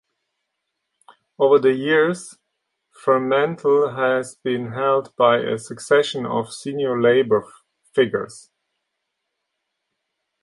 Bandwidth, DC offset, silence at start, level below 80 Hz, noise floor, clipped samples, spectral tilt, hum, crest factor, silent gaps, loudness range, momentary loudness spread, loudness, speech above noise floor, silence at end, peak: 11.5 kHz; under 0.1%; 1.4 s; -68 dBFS; -78 dBFS; under 0.1%; -5 dB/octave; none; 18 dB; none; 3 LU; 10 LU; -20 LUFS; 59 dB; 2.05 s; -2 dBFS